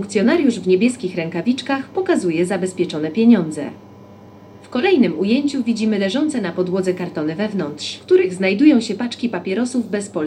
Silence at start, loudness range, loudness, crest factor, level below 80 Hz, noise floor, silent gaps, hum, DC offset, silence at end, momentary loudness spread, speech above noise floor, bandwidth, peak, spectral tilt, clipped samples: 0 s; 2 LU; -18 LUFS; 16 dB; -66 dBFS; -41 dBFS; none; none; under 0.1%; 0 s; 10 LU; 24 dB; 11.5 kHz; -2 dBFS; -5.5 dB/octave; under 0.1%